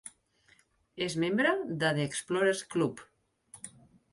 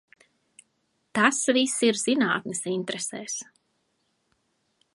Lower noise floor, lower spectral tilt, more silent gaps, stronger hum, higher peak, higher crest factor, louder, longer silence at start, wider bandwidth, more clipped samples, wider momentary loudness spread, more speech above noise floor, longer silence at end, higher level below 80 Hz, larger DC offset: second, -66 dBFS vs -73 dBFS; first, -4.5 dB/octave vs -2.5 dB/octave; neither; neither; second, -14 dBFS vs -4 dBFS; about the same, 20 dB vs 24 dB; second, -30 LUFS vs -25 LUFS; second, 0.05 s vs 1.15 s; about the same, 11.5 kHz vs 11.5 kHz; neither; first, 20 LU vs 11 LU; second, 36 dB vs 48 dB; second, 0.45 s vs 1.5 s; first, -70 dBFS vs -76 dBFS; neither